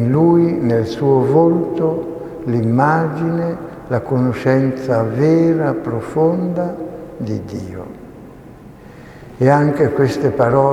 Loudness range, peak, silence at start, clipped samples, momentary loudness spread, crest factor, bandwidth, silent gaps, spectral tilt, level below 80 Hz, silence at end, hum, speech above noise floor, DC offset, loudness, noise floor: 6 LU; 0 dBFS; 0 s; under 0.1%; 15 LU; 16 dB; 12 kHz; none; -9 dB/octave; -48 dBFS; 0 s; none; 23 dB; under 0.1%; -16 LUFS; -38 dBFS